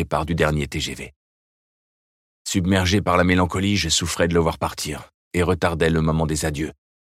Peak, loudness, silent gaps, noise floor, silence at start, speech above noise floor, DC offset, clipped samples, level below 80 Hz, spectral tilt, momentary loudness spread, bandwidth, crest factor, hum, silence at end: -2 dBFS; -21 LUFS; 1.16-2.45 s, 5.14-5.31 s; under -90 dBFS; 0 s; over 69 dB; under 0.1%; under 0.1%; -38 dBFS; -4.5 dB/octave; 11 LU; 15.5 kHz; 20 dB; none; 0.35 s